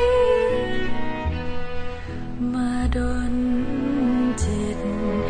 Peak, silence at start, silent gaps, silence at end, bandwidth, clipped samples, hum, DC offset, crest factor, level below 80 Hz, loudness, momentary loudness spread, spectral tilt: -8 dBFS; 0 s; none; 0 s; 9.8 kHz; under 0.1%; none; under 0.1%; 14 dB; -32 dBFS; -24 LUFS; 12 LU; -6.5 dB/octave